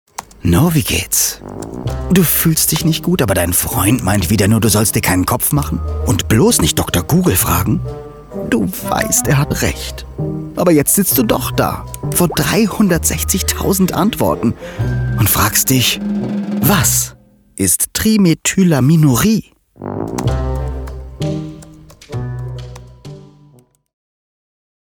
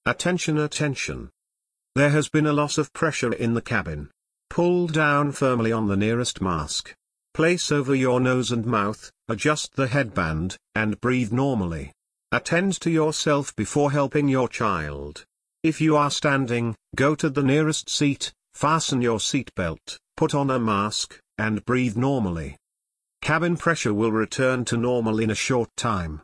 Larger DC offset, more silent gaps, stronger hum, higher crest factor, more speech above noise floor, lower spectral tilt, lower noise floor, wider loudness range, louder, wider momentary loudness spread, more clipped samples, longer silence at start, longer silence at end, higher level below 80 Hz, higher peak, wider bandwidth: neither; neither; neither; about the same, 14 dB vs 16 dB; second, 34 dB vs 61 dB; about the same, -4.5 dB/octave vs -5 dB/octave; second, -48 dBFS vs -84 dBFS; first, 10 LU vs 2 LU; first, -14 LUFS vs -23 LUFS; first, 14 LU vs 9 LU; neither; first, 0.2 s vs 0.05 s; first, 1.65 s vs 0.05 s; first, -30 dBFS vs -48 dBFS; first, 0 dBFS vs -8 dBFS; first, over 20 kHz vs 10.5 kHz